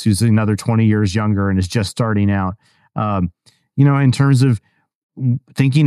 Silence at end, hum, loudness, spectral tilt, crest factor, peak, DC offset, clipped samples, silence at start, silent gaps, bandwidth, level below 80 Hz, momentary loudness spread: 0 s; none; -17 LUFS; -7 dB/octave; 14 dB; -2 dBFS; under 0.1%; under 0.1%; 0 s; 4.95-5.09 s; 13.5 kHz; -46 dBFS; 10 LU